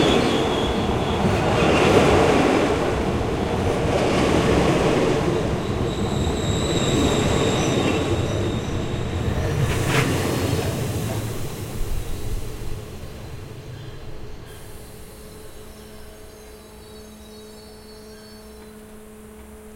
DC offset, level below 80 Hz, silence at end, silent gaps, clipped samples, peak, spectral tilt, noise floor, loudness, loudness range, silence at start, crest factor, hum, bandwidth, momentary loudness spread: under 0.1%; -34 dBFS; 0 s; none; under 0.1%; -2 dBFS; -5.5 dB/octave; -42 dBFS; -21 LUFS; 22 LU; 0 s; 20 dB; none; 16.5 kHz; 23 LU